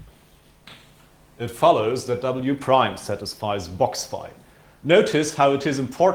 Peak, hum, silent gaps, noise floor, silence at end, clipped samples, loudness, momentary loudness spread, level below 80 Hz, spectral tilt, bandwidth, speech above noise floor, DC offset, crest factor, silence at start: -2 dBFS; none; none; -54 dBFS; 0 s; under 0.1%; -21 LUFS; 15 LU; -56 dBFS; -5 dB/octave; 20 kHz; 33 dB; under 0.1%; 20 dB; 0 s